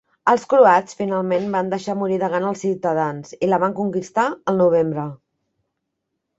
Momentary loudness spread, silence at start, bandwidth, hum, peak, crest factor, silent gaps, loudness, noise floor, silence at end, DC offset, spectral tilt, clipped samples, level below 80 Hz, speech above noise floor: 10 LU; 0.25 s; 8 kHz; none; -2 dBFS; 18 dB; none; -19 LUFS; -77 dBFS; 1.25 s; under 0.1%; -6.5 dB/octave; under 0.1%; -64 dBFS; 59 dB